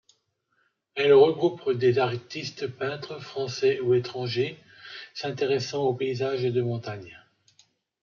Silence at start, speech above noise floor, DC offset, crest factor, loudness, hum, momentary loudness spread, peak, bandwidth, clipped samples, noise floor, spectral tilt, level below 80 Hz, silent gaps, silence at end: 0.95 s; 47 dB; under 0.1%; 20 dB; -26 LUFS; none; 17 LU; -6 dBFS; 7.2 kHz; under 0.1%; -72 dBFS; -6 dB/octave; -72 dBFS; none; 0.85 s